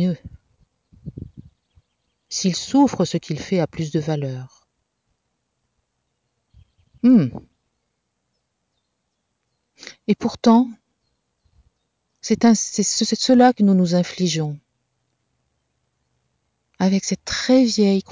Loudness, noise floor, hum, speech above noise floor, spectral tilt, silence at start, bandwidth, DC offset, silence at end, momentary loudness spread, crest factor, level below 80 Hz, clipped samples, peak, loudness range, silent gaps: -19 LUFS; -74 dBFS; none; 56 dB; -5 dB/octave; 0 s; 7.8 kHz; under 0.1%; 0 s; 18 LU; 18 dB; -54 dBFS; under 0.1%; -4 dBFS; 9 LU; none